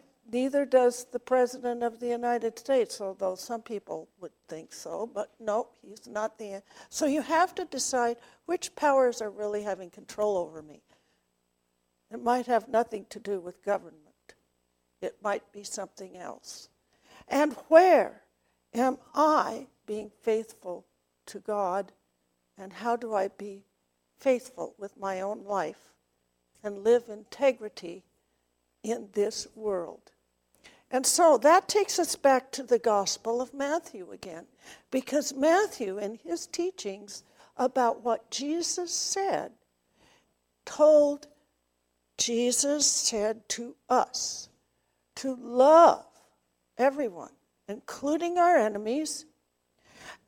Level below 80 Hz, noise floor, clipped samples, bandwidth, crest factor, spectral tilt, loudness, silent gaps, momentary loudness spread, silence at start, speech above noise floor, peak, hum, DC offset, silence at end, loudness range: -74 dBFS; -76 dBFS; under 0.1%; 17.5 kHz; 24 dB; -2.5 dB/octave; -27 LUFS; none; 20 LU; 0.3 s; 49 dB; -6 dBFS; 60 Hz at -65 dBFS; under 0.1%; 0.15 s; 9 LU